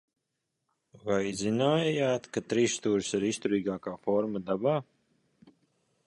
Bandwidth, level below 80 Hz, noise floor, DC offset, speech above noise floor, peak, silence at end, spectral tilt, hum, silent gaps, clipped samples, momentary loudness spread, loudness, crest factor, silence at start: 11.5 kHz; -66 dBFS; -83 dBFS; under 0.1%; 54 dB; -12 dBFS; 1.25 s; -5 dB/octave; none; none; under 0.1%; 6 LU; -29 LUFS; 18 dB; 1.05 s